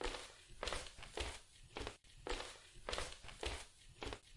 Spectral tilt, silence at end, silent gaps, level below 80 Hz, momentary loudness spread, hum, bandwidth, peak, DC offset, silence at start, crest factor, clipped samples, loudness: -2.5 dB/octave; 0 s; none; -54 dBFS; 9 LU; none; 11.5 kHz; -24 dBFS; under 0.1%; 0 s; 24 dB; under 0.1%; -48 LUFS